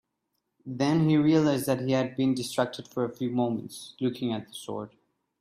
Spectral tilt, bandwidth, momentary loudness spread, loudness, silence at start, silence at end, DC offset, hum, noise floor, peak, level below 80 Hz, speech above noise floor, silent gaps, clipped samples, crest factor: -6.5 dB/octave; 15.5 kHz; 15 LU; -27 LUFS; 0.65 s; 0.55 s; under 0.1%; none; -80 dBFS; -10 dBFS; -66 dBFS; 53 dB; none; under 0.1%; 18 dB